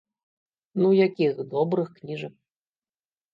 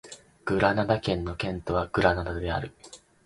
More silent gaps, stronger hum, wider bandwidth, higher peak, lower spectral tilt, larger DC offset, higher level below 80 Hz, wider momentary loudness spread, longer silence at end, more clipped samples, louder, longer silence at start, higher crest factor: neither; neither; second, 5.4 kHz vs 11.5 kHz; second, -8 dBFS vs -4 dBFS; first, -9 dB/octave vs -6 dB/octave; neither; second, -78 dBFS vs -44 dBFS; first, 15 LU vs 11 LU; first, 1.05 s vs 0.3 s; neither; first, -24 LUFS vs -27 LUFS; first, 0.75 s vs 0.05 s; second, 18 dB vs 24 dB